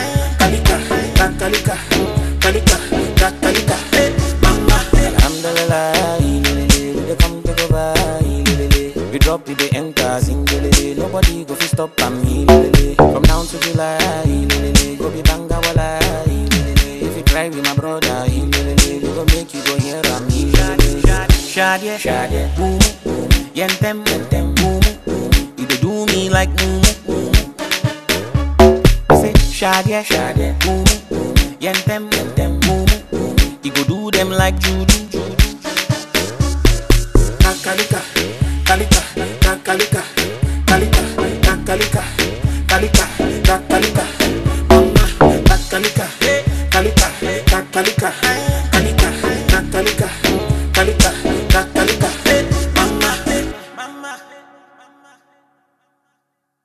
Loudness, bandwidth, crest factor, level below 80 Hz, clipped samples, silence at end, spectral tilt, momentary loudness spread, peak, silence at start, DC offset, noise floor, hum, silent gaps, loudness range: -15 LUFS; 14 kHz; 14 dB; -18 dBFS; under 0.1%; 2.25 s; -4.5 dB/octave; 6 LU; 0 dBFS; 0 s; under 0.1%; -71 dBFS; none; none; 3 LU